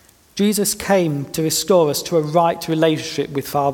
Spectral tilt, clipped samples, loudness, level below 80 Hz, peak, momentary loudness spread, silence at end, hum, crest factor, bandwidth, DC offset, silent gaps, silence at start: -4.5 dB/octave; under 0.1%; -18 LUFS; -52 dBFS; -2 dBFS; 7 LU; 0 s; none; 16 dB; 18.5 kHz; under 0.1%; none; 0.35 s